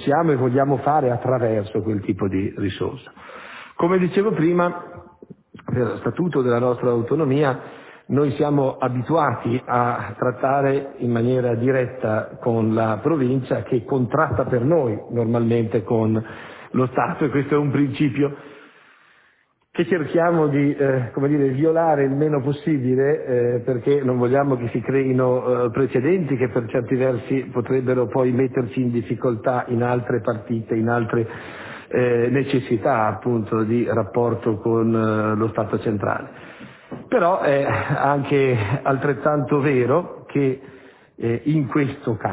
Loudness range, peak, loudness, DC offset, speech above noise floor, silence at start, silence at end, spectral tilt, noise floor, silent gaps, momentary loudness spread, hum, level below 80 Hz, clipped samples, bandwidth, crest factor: 3 LU; -4 dBFS; -21 LUFS; under 0.1%; 41 dB; 0 s; 0 s; -12 dB/octave; -61 dBFS; none; 7 LU; none; -52 dBFS; under 0.1%; 4 kHz; 16 dB